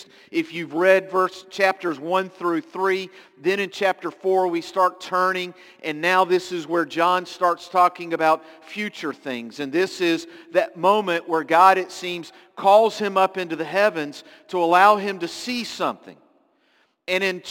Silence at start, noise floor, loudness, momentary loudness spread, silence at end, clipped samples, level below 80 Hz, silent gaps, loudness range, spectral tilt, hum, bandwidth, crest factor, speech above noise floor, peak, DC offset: 0 s; -64 dBFS; -21 LUFS; 14 LU; 0 s; under 0.1%; -74 dBFS; none; 4 LU; -4.5 dB/octave; none; 17 kHz; 20 dB; 42 dB; -2 dBFS; under 0.1%